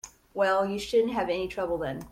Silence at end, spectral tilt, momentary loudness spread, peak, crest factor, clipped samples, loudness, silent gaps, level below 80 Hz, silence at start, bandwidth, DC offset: 0 s; -5 dB/octave; 6 LU; -14 dBFS; 14 dB; under 0.1%; -28 LUFS; none; -54 dBFS; 0.05 s; 16 kHz; under 0.1%